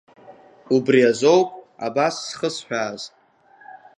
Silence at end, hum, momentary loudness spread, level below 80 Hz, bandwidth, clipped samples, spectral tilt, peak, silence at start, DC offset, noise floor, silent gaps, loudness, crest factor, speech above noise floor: 0.2 s; none; 14 LU; -72 dBFS; 10.5 kHz; under 0.1%; -4.5 dB/octave; -4 dBFS; 0.3 s; under 0.1%; -52 dBFS; none; -20 LUFS; 18 dB; 33 dB